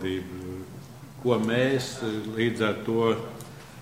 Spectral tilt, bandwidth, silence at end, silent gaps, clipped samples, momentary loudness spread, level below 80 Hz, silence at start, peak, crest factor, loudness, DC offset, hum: -5.5 dB/octave; 16 kHz; 0 s; none; under 0.1%; 18 LU; -60 dBFS; 0 s; -10 dBFS; 18 dB; -27 LUFS; 0.1%; none